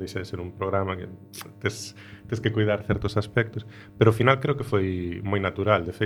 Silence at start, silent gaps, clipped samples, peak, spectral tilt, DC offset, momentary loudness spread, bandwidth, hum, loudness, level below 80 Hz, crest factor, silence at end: 0 s; none; under 0.1%; -2 dBFS; -6.5 dB/octave; under 0.1%; 17 LU; 15 kHz; none; -26 LUFS; -50 dBFS; 24 dB; 0 s